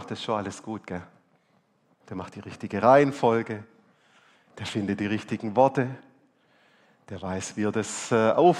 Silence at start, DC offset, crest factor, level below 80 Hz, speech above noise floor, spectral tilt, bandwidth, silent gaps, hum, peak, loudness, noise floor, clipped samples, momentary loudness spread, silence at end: 0 s; under 0.1%; 22 dB; -68 dBFS; 42 dB; -5.5 dB/octave; 12 kHz; none; none; -4 dBFS; -25 LUFS; -67 dBFS; under 0.1%; 19 LU; 0 s